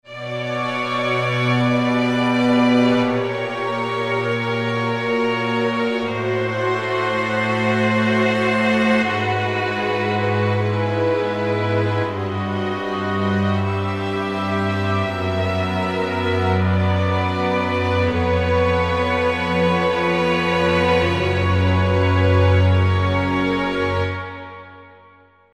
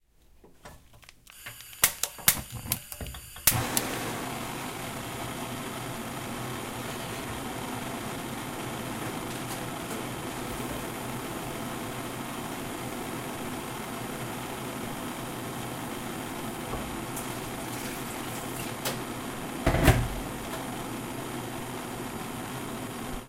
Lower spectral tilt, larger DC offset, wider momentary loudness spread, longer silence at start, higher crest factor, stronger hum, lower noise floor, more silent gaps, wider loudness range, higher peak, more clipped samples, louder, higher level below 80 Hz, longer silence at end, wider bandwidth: first, -7 dB/octave vs -3.5 dB/octave; first, 0.3% vs under 0.1%; second, 6 LU vs 11 LU; second, 0.05 s vs 0.35 s; second, 14 dB vs 30 dB; neither; second, -50 dBFS vs -57 dBFS; neither; second, 4 LU vs 7 LU; about the same, -4 dBFS vs -4 dBFS; neither; first, -19 LUFS vs -32 LUFS; about the same, -42 dBFS vs -44 dBFS; first, 0.6 s vs 0 s; second, 10.5 kHz vs 16 kHz